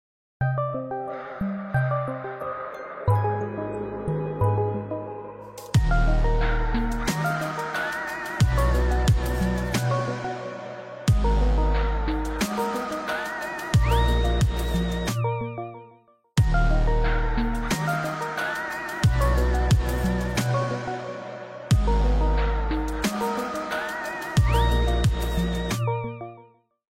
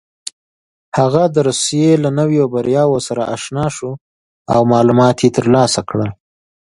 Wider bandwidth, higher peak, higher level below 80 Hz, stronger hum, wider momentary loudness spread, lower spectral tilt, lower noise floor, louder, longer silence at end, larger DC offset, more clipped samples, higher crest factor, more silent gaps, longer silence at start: first, 16 kHz vs 11.5 kHz; second, -10 dBFS vs 0 dBFS; first, -28 dBFS vs -50 dBFS; neither; second, 10 LU vs 14 LU; about the same, -6 dB/octave vs -5.5 dB/octave; second, -55 dBFS vs under -90 dBFS; second, -26 LUFS vs -14 LUFS; about the same, 0.45 s vs 0.5 s; neither; neither; about the same, 14 dB vs 14 dB; second, none vs 4.01-4.45 s; second, 0.4 s vs 0.95 s